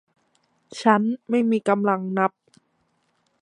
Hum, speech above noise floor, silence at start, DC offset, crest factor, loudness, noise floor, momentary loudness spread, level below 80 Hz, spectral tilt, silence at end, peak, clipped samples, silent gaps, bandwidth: none; 48 dB; 0.7 s; under 0.1%; 22 dB; -22 LUFS; -69 dBFS; 5 LU; -76 dBFS; -6.5 dB/octave; 1.15 s; -2 dBFS; under 0.1%; none; 10.5 kHz